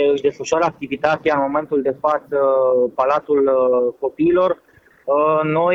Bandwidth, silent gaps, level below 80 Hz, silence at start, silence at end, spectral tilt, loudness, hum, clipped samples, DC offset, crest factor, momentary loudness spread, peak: 7.8 kHz; none; -58 dBFS; 0 s; 0 s; -6 dB/octave; -18 LUFS; none; under 0.1%; under 0.1%; 16 dB; 5 LU; -2 dBFS